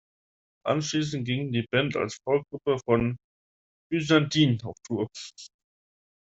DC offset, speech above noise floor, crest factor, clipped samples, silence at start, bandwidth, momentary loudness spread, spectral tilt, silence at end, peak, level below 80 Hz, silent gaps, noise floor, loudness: under 0.1%; over 64 dB; 20 dB; under 0.1%; 0.65 s; 8 kHz; 12 LU; -5.5 dB/octave; 0.75 s; -8 dBFS; -60 dBFS; 3.24-3.90 s; under -90 dBFS; -27 LUFS